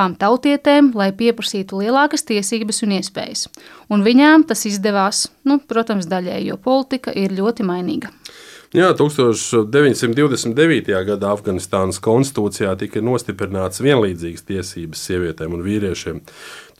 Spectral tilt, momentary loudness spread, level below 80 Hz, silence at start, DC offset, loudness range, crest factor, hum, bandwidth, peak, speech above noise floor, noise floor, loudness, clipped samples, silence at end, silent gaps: -5 dB/octave; 12 LU; -52 dBFS; 0 s; under 0.1%; 5 LU; 16 dB; none; 15 kHz; -2 dBFS; 23 dB; -40 dBFS; -17 LUFS; under 0.1%; 0.15 s; none